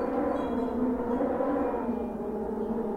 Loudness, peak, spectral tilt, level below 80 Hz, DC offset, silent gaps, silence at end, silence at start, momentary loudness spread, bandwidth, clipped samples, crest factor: -30 LUFS; -18 dBFS; -8.5 dB/octave; -50 dBFS; under 0.1%; none; 0 s; 0 s; 5 LU; 8.8 kHz; under 0.1%; 12 dB